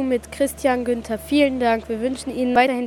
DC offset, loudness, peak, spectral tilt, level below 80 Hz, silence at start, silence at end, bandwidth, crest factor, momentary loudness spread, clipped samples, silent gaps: under 0.1%; -21 LUFS; -4 dBFS; -4.5 dB/octave; -46 dBFS; 0 s; 0 s; 18 kHz; 16 dB; 7 LU; under 0.1%; none